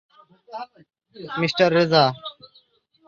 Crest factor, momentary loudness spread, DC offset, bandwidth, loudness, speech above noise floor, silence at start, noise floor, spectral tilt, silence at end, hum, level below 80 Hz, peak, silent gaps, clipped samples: 20 dB; 23 LU; under 0.1%; 7.4 kHz; -19 LUFS; 39 dB; 0.5 s; -60 dBFS; -6 dB/octave; 0.75 s; none; -66 dBFS; -4 dBFS; none; under 0.1%